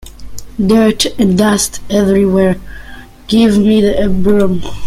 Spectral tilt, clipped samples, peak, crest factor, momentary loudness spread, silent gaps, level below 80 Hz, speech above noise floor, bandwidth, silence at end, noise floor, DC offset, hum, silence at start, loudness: -5.5 dB/octave; under 0.1%; 0 dBFS; 12 dB; 12 LU; none; -30 dBFS; 21 dB; 14.5 kHz; 0 s; -32 dBFS; under 0.1%; none; 0.05 s; -12 LUFS